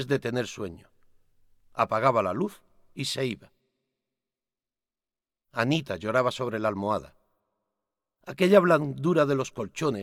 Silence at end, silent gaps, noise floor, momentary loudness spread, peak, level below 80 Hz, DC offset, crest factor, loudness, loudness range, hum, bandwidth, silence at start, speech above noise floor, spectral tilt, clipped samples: 0 s; none; under -90 dBFS; 17 LU; -6 dBFS; -64 dBFS; under 0.1%; 22 dB; -26 LUFS; 7 LU; none; 16 kHz; 0 s; over 64 dB; -6 dB/octave; under 0.1%